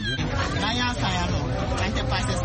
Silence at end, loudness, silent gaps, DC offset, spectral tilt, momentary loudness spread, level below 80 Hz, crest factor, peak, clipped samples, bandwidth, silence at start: 0 s; -25 LUFS; none; under 0.1%; -5 dB/octave; 2 LU; -32 dBFS; 14 dB; -12 dBFS; under 0.1%; 8.8 kHz; 0 s